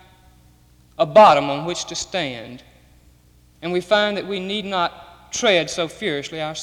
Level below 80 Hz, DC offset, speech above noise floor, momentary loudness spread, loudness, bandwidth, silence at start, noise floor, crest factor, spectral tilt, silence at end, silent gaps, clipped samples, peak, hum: -54 dBFS; under 0.1%; 34 dB; 16 LU; -19 LUFS; 12.5 kHz; 1 s; -53 dBFS; 18 dB; -3.5 dB/octave; 0 s; none; under 0.1%; -2 dBFS; none